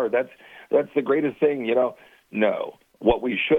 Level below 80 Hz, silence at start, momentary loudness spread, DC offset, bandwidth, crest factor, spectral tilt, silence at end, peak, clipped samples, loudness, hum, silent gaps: -48 dBFS; 0 s; 10 LU; under 0.1%; 3.9 kHz; 18 dB; -7.5 dB/octave; 0 s; -4 dBFS; under 0.1%; -24 LUFS; none; none